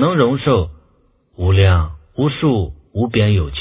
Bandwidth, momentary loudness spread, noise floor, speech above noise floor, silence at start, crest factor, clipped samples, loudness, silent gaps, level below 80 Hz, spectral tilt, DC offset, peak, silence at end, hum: 4 kHz; 9 LU; -56 dBFS; 42 dB; 0 s; 16 dB; under 0.1%; -17 LUFS; none; -26 dBFS; -11.5 dB/octave; under 0.1%; 0 dBFS; 0 s; none